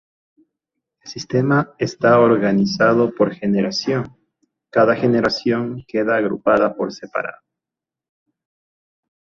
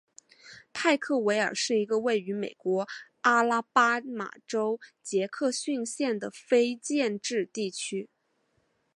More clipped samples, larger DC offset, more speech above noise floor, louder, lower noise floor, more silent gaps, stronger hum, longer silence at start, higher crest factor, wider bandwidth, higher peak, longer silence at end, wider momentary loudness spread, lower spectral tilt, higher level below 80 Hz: neither; neither; first, 70 dB vs 45 dB; first, -18 LUFS vs -28 LUFS; first, -87 dBFS vs -73 dBFS; neither; neither; first, 1.05 s vs 0.45 s; about the same, 18 dB vs 22 dB; second, 7.4 kHz vs 11.5 kHz; first, -2 dBFS vs -8 dBFS; first, 1.95 s vs 0.9 s; about the same, 11 LU vs 11 LU; first, -6.5 dB/octave vs -3.5 dB/octave; first, -58 dBFS vs -82 dBFS